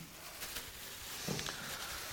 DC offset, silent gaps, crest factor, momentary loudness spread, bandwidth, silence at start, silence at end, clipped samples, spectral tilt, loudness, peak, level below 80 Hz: under 0.1%; none; 22 dB; 6 LU; 17.5 kHz; 0 s; 0 s; under 0.1%; -2 dB/octave; -42 LUFS; -22 dBFS; -62 dBFS